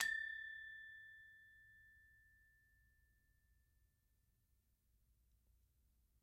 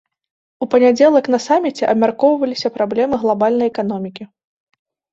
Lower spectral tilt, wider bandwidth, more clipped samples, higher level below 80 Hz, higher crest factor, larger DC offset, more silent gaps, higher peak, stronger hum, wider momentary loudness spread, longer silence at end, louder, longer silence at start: second, 1 dB/octave vs -5.5 dB/octave; first, 15.5 kHz vs 7.8 kHz; neither; second, -80 dBFS vs -58 dBFS; first, 34 dB vs 16 dB; neither; neither; second, -22 dBFS vs -2 dBFS; neither; first, 23 LU vs 11 LU; first, 3.9 s vs 0.9 s; second, -48 LUFS vs -16 LUFS; second, 0 s vs 0.6 s